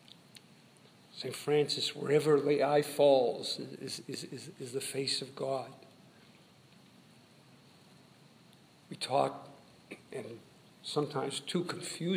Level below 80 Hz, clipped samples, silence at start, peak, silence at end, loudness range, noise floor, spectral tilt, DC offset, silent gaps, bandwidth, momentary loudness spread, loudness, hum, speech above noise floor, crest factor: -84 dBFS; under 0.1%; 0.35 s; -14 dBFS; 0 s; 10 LU; -61 dBFS; -4.5 dB/octave; under 0.1%; none; 15.5 kHz; 22 LU; -33 LUFS; none; 28 dB; 22 dB